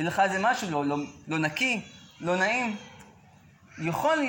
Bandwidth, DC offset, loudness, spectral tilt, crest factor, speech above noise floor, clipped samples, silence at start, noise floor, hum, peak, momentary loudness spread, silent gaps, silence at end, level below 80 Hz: 17 kHz; under 0.1%; -27 LUFS; -4.5 dB/octave; 18 dB; 28 dB; under 0.1%; 0 s; -56 dBFS; none; -10 dBFS; 11 LU; none; 0 s; -66 dBFS